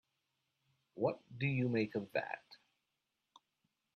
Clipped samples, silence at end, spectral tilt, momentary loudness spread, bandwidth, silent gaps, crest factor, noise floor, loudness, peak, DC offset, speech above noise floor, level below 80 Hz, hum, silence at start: under 0.1%; 1.4 s; -8.5 dB/octave; 12 LU; 6.4 kHz; none; 20 dB; -87 dBFS; -39 LUFS; -22 dBFS; under 0.1%; 50 dB; -80 dBFS; none; 0.95 s